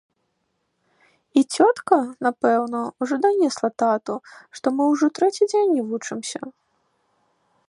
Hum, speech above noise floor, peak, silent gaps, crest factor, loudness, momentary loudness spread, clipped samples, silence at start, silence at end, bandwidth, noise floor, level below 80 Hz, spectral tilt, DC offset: none; 52 dB; -2 dBFS; none; 20 dB; -21 LUFS; 12 LU; under 0.1%; 1.35 s; 1.2 s; 11.5 kHz; -73 dBFS; -76 dBFS; -4 dB/octave; under 0.1%